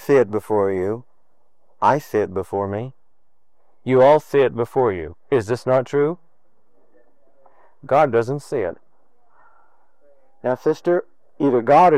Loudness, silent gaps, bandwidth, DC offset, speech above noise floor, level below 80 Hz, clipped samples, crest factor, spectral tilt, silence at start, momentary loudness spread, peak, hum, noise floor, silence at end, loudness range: -20 LUFS; none; 14.5 kHz; 0.5%; 54 dB; -60 dBFS; under 0.1%; 18 dB; -7.5 dB/octave; 0 s; 13 LU; -4 dBFS; none; -72 dBFS; 0 s; 5 LU